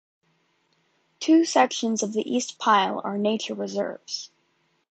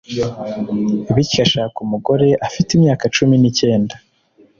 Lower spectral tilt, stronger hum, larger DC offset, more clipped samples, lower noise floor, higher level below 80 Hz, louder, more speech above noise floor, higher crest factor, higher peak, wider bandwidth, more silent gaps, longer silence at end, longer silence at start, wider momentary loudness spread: second, -3.5 dB/octave vs -5.5 dB/octave; neither; neither; neither; first, -69 dBFS vs -52 dBFS; second, -76 dBFS vs -44 dBFS; second, -24 LUFS vs -16 LUFS; first, 46 dB vs 37 dB; first, 20 dB vs 14 dB; about the same, -4 dBFS vs -2 dBFS; first, 8.8 kHz vs 7.6 kHz; neither; about the same, 0.65 s vs 0.6 s; first, 1.2 s vs 0.1 s; first, 13 LU vs 9 LU